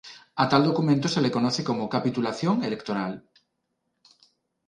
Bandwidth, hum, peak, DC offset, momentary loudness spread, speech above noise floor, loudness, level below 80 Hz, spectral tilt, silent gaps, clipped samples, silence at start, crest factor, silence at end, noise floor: 10.5 kHz; none; -6 dBFS; under 0.1%; 9 LU; 53 dB; -25 LUFS; -66 dBFS; -6 dB/octave; none; under 0.1%; 0.05 s; 20 dB; 1.5 s; -78 dBFS